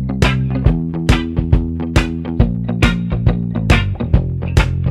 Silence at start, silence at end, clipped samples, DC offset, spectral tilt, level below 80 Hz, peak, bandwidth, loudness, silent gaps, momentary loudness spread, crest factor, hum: 0 s; 0 s; under 0.1%; under 0.1%; -6.5 dB/octave; -20 dBFS; 0 dBFS; 12.5 kHz; -17 LUFS; none; 3 LU; 14 dB; none